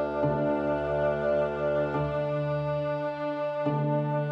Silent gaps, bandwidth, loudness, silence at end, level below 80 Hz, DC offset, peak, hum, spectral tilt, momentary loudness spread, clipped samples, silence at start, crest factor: none; 6.2 kHz; -28 LUFS; 0 s; -50 dBFS; under 0.1%; -14 dBFS; none; -9.5 dB/octave; 4 LU; under 0.1%; 0 s; 12 dB